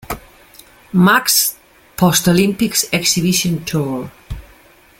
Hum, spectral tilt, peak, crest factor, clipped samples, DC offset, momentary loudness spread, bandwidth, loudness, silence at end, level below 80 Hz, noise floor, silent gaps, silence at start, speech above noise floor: none; -3.5 dB/octave; 0 dBFS; 18 dB; under 0.1%; under 0.1%; 20 LU; 17 kHz; -14 LUFS; 0.6 s; -42 dBFS; -47 dBFS; none; 0.1 s; 32 dB